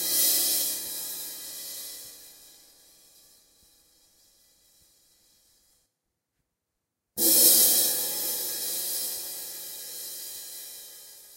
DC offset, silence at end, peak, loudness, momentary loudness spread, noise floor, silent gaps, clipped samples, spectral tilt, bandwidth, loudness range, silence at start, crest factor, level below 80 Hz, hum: under 0.1%; 0 s; -4 dBFS; -23 LUFS; 23 LU; -84 dBFS; none; under 0.1%; 1 dB/octave; 16 kHz; 18 LU; 0 s; 26 dB; -70 dBFS; none